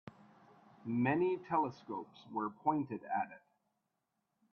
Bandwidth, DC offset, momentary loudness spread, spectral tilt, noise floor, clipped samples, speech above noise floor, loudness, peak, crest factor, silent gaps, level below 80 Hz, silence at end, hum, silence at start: 6.6 kHz; under 0.1%; 13 LU; -9 dB/octave; -85 dBFS; under 0.1%; 49 dB; -37 LUFS; -18 dBFS; 20 dB; none; -80 dBFS; 1.15 s; none; 0.05 s